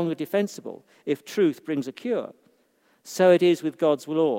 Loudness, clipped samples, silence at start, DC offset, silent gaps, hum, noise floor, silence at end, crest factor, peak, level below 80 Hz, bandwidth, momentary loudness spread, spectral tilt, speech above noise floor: -24 LUFS; under 0.1%; 0 s; under 0.1%; none; none; -65 dBFS; 0 s; 18 dB; -6 dBFS; -80 dBFS; 16.5 kHz; 18 LU; -6 dB/octave; 41 dB